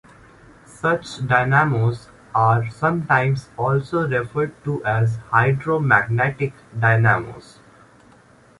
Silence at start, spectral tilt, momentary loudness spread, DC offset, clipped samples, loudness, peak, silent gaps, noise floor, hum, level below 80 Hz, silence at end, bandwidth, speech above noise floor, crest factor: 0.85 s; -7.5 dB/octave; 8 LU; under 0.1%; under 0.1%; -20 LUFS; -2 dBFS; none; -51 dBFS; none; -50 dBFS; 1.2 s; 11.5 kHz; 31 dB; 20 dB